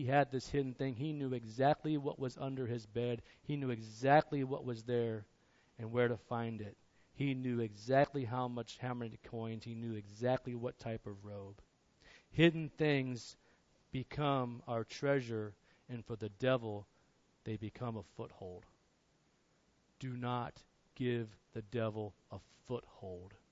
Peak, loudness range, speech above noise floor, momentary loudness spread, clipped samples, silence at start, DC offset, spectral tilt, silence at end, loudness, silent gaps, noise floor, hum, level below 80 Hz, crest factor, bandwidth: -16 dBFS; 8 LU; 37 dB; 17 LU; under 0.1%; 0 s; under 0.1%; -5.5 dB/octave; 0.15 s; -38 LUFS; none; -74 dBFS; none; -68 dBFS; 22 dB; 7.6 kHz